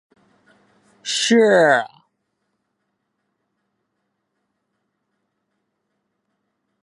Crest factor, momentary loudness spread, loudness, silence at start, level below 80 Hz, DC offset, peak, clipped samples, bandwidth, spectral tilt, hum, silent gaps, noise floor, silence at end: 22 dB; 19 LU; -16 LUFS; 1.05 s; -80 dBFS; under 0.1%; -2 dBFS; under 0.1%; 11.5 kHz; -3 dB/octave; none; none; -74 dBFS; 4.95 s